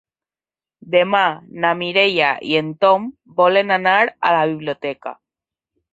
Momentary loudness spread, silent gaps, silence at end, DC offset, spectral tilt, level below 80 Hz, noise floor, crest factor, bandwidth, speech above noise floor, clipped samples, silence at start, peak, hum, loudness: 11 LU; none; 0.8 s; under 0.1%; -6 dB/octave; -66 dBFS; under -90 dBFS; 18 dB; 7.8 kHz; over 73 dB; under 0.1%; 0.85 s; -2 dBFS; none; -17 LUFS